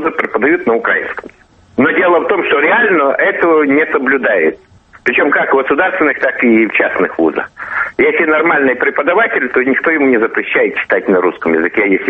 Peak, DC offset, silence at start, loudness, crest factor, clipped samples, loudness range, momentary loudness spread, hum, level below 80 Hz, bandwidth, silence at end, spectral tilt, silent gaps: 0 dBFS; under 0.1%; 0 s; -12 LUFS; 12 dB; under 0.1%; 1 LU; 5 LU; none; -52 dBFS; 5.8 kHz; 0 s; -7.5 dB/octave; none